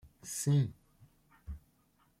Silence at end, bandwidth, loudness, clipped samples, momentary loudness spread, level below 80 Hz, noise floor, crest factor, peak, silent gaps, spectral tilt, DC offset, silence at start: 0.6 s; 15.5 kHz; -33 LUFS; under 0.1%; 21 LU; -56 dBFS; -71 dBFS; 16 dB; -20 dBFS; none; -6 dB/octave; under 0.1%; 0.05 s